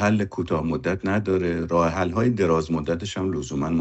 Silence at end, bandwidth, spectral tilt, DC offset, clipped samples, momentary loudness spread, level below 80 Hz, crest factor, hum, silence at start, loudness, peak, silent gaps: 0 s; 8.4 kHz; -6.5 dB/octave; under 0.1%; under 0.1%; 5 LU; -44 dBFS; 16 dB; none; 0 s; -24 LUFS; -8 dBFS; none